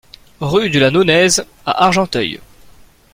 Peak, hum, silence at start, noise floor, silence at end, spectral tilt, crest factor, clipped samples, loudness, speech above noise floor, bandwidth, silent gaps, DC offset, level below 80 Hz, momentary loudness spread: 0 dBFS; none; 0.4 s; -43 dBFS; 0.75 s; -4 dB/octave; 16 dB; under 0.1%; -14 LUFS; 30 dB; 16.5 kHz; none; under 0.1%; -44 dBFS; 11 LU